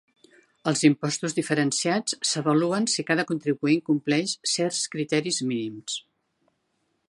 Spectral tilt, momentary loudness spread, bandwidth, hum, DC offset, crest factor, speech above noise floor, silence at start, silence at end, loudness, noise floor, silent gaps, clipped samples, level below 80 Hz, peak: -4 dB/octave; 8 LU; 11.5 kHz; none; under 0.1%; 20 dB; 49 dB; 0.65 s; 1.1 s; -25 LUFS; -74 dBFS; none; under 0.1%; -74 dBFS; -6 dBFS